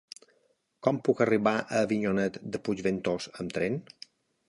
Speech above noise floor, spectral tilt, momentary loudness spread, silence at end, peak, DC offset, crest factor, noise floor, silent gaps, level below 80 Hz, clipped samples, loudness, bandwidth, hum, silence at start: 43 dB; -6 dB/octave; 23 LU; 0.65 s; -10 dBFS; under 0.1%; 20 dB; -71 dBFS; none; -64 dBFS; under 0.1%; -29 LUFS; 11.5 kHz; none; 0.85 s